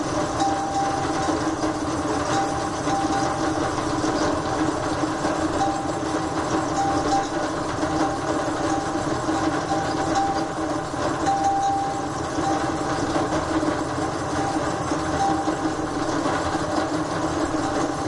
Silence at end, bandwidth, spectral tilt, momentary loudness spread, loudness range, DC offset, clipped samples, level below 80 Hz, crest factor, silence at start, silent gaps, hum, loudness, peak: 0 s; 11.5 kHz; -5 dB/octave; 3 LU; 1 LU; under 0.1%; under 0.1%; -44 dBFS; 16 dB; 0 s; none; none; -24 LUFS; -8 dBFS